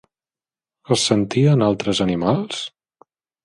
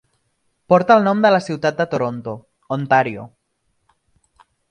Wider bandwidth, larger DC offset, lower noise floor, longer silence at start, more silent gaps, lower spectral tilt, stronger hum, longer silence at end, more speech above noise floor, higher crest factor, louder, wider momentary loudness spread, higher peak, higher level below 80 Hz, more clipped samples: first, 11.5 kHz vs 10 kHz; neither; first, under -90 dBFS vs -69 dBFS; first, 0.9 s vs 0.7 s; neither; about the same, -5.5 dB/octave vs -6.5 dB/octave; neither; second, 0.75 s vs 1.45 s; first, over 72 dB vs 52 dB; about the same, 18 dB vs 20 dB; about the same, -19 LUFS vs -17 LUFS; second, 12 LU vs 17 LU; about the same, -2 dBFS vs 0 dBFS; first, -52 dBFS vs -62 dBFS; neither